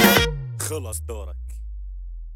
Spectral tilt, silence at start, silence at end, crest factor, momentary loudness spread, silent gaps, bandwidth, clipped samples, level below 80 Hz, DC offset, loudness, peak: -3.5 dB/octave; 0 s; 0 s; 22 dB; 19 LU; none; 17.5 kHz; under 0.1%; -34 dBFS; under 0.1%; -24 LUFS; -2 dBFS